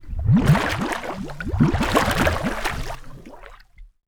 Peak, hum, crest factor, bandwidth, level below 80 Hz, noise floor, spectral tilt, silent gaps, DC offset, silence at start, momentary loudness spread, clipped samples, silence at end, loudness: -2 dBFS; none; 20 dB; 19 kHz; -32 dBFS; -45 dBFS; -6 dB/octave; none; under 0.1%; 0 s; 14 LU; under 0.1%; 0.2 s; -21 LUFS